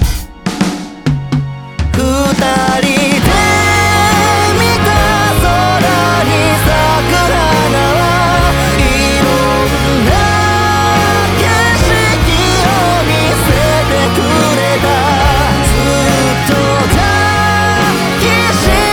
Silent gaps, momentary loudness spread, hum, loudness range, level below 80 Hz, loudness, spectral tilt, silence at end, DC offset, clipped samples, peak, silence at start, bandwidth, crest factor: none; 3 LU; none; 1 LU; -20 dBFS; -10 LUFS; -4.5 dB/octave; 0 s; under 0.1%; under 0.1%; 0 dBFS; 0 s; over 20 kHz; 10 dB